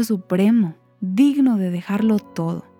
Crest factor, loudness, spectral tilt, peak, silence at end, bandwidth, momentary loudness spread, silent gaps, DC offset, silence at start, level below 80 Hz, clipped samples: 12 dB; -19 LUFS; -7.5 dB/octave; -6 dBFS; 0.2 s; 16.5 kHz; 10 LU; none; under 0.1%; 0 s; -68 dBFS; under 0.1%